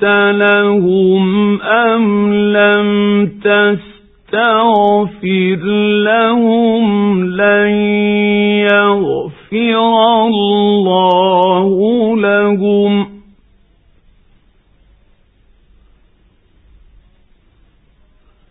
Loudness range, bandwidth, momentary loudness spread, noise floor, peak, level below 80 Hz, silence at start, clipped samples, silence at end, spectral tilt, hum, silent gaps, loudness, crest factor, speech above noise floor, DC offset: 4 LU; 4 kHz; 4 LU; -51 dBFS; 0 dBFS; -50 dBFS; 0 s; under 0.1%; 5.35 s; -9.5 dB/octave; none; none; -11 LUFS; 12 dB; 40 dB; under 0.1%